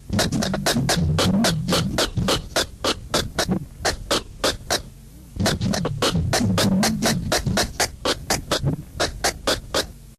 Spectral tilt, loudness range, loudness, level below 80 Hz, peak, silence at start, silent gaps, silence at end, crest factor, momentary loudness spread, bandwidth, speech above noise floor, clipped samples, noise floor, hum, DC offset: -4 dB/octave; 3 LU; -22 LUFS; -36 dBFS; -8 dBFS; 0 s; none; 0.05 s; 14 dB; 6 LU; 15 kHz; 22 dB; under 0.1%; -42 dBFS; none; under 0.1%